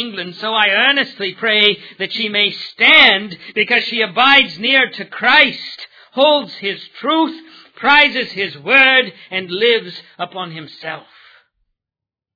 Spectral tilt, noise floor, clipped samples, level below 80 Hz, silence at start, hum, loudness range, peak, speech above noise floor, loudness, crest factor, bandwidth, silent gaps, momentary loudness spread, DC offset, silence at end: -4.5 dB/octave; -86 dBFS; 0.1%; -58 dBFS; 0 s; none; 4 LU; 0 dBFS; 71 dB; -13 LUFS; 16 dB; 5.4 kHz; none; 18 LU; under 0.1%; 1.35 s